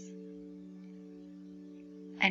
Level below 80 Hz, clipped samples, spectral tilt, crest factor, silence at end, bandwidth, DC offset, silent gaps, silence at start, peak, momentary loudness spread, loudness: -76 dBFS; under 0.1%; -4.5 dB/octave; 28 dB; 0 s; 7.8 kHz; under 0.1%; none; 0 s; -12 dBFS; 4 LU; -43 LUFS